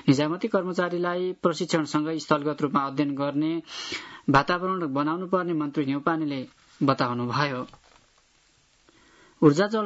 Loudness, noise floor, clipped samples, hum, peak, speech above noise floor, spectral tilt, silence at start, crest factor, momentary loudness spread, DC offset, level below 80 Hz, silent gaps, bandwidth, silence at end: -26 LUFS; -63 dBFS; under 0.1%; none; -6 dBFS; 38 dB; -6 dB/octave; 0.05 s; 20 dB; 10 LU; under 0.1%; -62 dBFS; none; 8 kHz; 0 s